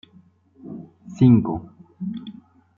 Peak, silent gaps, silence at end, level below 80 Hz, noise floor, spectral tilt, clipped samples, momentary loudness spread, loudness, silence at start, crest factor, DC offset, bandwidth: -4 dBFS; none; 0.45 s; -56 dBFS; -54 dBFS; -10 dB/octave; under 0.1%; 24 LU; -20 LUFS; 0.65 s; 20 dB; under 0.1%; 7.2 kHz